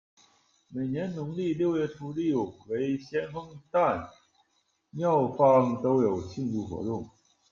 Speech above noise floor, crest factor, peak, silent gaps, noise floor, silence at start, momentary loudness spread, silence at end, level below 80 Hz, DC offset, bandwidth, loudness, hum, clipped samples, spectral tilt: 46 dB; 20 dB; -10 dBFS; none; -73 dBFS; 0.7 s; 14 LU; 0.45 s; -64 dBFS; under 0.1%; 7.2 kHz; -28 LUFS; none; under 0.1%; -8 dB/octave